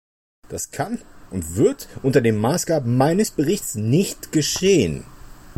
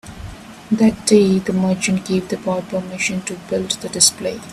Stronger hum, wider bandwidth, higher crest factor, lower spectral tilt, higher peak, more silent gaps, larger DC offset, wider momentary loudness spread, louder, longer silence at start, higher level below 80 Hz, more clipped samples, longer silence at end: neither; first, 16.5 kHz vs 13.5 kHz; about the same, 16 dB vs 18 dB; about the same, -5 dB/octave vs -4 dB/octave; second, -6 dBFS vs 0 dBFS; neither; neither; about the same, 13 LU vs 13 LU; about the same, -20 LUFS vs -18 LUFS; first, 0.5 s vs 0.05 s; about the same, -46 dBFS vs -46 dBFS; neither; about the same, 0.05 s vs 0 s